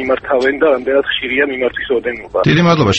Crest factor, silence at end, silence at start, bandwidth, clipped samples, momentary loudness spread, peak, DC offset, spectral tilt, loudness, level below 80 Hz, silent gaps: 14 dB; 0 s; 0 s; 8.4 kHz; under 0.1%; 7 LU; 0 dBFS; under 0.1%; -6 dB/octave; -14 LUFS; -42 dBFS; none